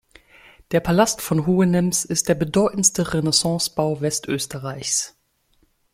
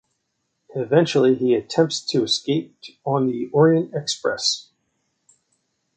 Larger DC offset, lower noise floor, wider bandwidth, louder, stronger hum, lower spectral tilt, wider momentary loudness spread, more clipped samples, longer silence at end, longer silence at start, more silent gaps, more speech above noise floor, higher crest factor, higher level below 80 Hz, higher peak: neither; second, -63 dBFS vs -74 dBFS; first, 16 kHz vs 9.2 kHz; about the same, -20 LUFS vs -20 LUFS; neither; about the same, -4 dB/octave vs -5 dB/octave; second, 7 LU vs 12 LU; neither; second, 0.85 s vs 1.35 s; about the same, 0.7 s vs 0.75 s; neither; second, 43 dB vs 54 dB; about the same, 20 dB vs 18 dB; first, -50 dBFS vs -66 dBFS; about the same, -2 dBFS vs -4 dBFS